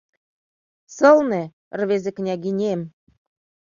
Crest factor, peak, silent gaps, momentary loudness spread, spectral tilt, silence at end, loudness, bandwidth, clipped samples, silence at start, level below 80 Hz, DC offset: 20 dB; -2 dBFS; 1.53-1.71 s; 14 LU; -6.5 dB/octave; 0.9 s; -20 LUFS; 7.4 kHz; under 0.1%; 0.9 s; -66 dBFS; under 0.1%